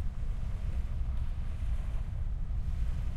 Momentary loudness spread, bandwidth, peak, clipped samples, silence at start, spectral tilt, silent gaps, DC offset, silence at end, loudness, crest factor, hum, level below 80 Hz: 2 LU; 5.2 kHz; -20 dBFS; under 0.1%; 0 s; -7.5 dB/octave; none; under 0.1%; 0 s; -38 LUFS; 12 dB; none; -32 dBFS